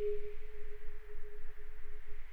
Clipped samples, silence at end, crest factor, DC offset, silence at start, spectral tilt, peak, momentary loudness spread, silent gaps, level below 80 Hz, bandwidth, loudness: under 0.1%; 0 s; 8 dB; under 0.1%; 0 s; -7 dB/octave; -24 dBFS; 10 LU; none; -44 dBFS; 3 kHz; -50 LUFS